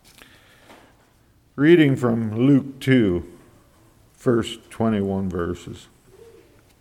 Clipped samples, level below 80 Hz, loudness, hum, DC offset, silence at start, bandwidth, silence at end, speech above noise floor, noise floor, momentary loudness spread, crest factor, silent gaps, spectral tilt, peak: under 0.1%; -52 dBFS; -20 LUFS; none; under 0.1%; 1.55 s; 14 kHz; 1.05 s; 38 dB; -57 dBFS; 19 LU; 20 dB; none; -7.5 dB/octave; -2 dBFS